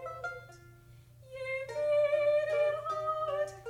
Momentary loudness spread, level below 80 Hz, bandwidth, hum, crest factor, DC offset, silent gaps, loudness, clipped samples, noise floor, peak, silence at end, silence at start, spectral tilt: 14 LU; -66 dBFS; 10.5 kHz; none; 14 dB; under 0.1%; none; -32 LUFS; under 0.1%; -56 dBFS; -20 dBFS; 0 s; 0 s; -4.5 dB/octave